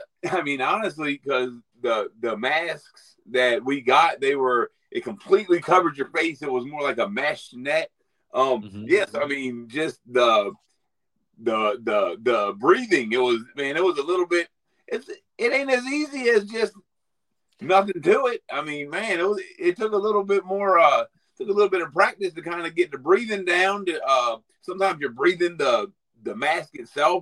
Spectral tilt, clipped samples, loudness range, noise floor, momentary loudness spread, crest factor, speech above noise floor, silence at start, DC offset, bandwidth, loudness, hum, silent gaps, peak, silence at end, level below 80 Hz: -4 dB/octave; under 0.1%; 3 LU; -83 dBFS; 11 LU; 20 dB; 60 dB; 0 s; under 0.1%; 11.5 kHz; -23 LUFS; none; none; -4 dBFS; 0 s; -74 dBFS